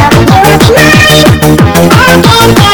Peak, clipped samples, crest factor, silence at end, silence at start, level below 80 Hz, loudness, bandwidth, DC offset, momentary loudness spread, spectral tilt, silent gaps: 0 dBFS; 40%; 2 dB; 0 s; 0 s; -22 dBFS; -2 LUFS; over 20 kHz; under 0.1%; 3 LU; -4.5 dB/octave; none